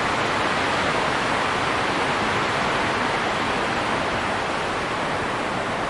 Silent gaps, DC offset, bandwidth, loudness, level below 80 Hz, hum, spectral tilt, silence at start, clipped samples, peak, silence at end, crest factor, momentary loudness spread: none; under 0.1%; 11.5 kHz; -22 LUFS; -46 dBFS; none; -4 dB/octave; 0 s; under 0.1%; -8 dBFS; 0 s; 14 dB; 3 LU